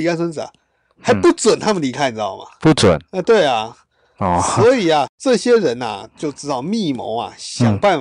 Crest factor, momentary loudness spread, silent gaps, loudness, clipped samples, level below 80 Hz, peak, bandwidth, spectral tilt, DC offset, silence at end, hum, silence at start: 12 dB; 12 LU; 5.09-5.18 s; -17 LUFS; under 0.1%; -48 dBFS; -6 dBFS; 11 kHz; -5 dB/octave; under 0.1%; 0 s; none; 0 s